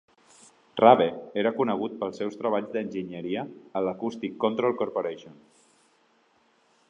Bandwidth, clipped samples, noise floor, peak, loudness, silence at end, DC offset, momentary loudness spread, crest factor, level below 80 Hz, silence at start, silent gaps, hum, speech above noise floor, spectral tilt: 10.5 kHz; under 0.1%; -65 dBFS; -4 dBFS; -26 LUFS; 1.6 s; under 0.1%; 14 LU; 24 dB; -72 dBFS; 0.75 s; none; none; 39 dB; -6.5 dB/octave